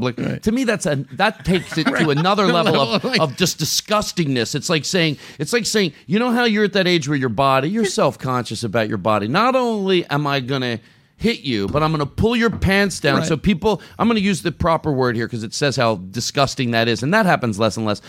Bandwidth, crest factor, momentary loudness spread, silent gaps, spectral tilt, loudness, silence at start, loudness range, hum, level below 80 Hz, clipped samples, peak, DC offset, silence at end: 16.5 kHz; 18 dB; 6 LU; none; -4.5 dB/octave; -18 LUFS; 0 s; 2 LU; none; -42 dBFS; under 0.1%; -2 dBFS; under 0.1%; 0 s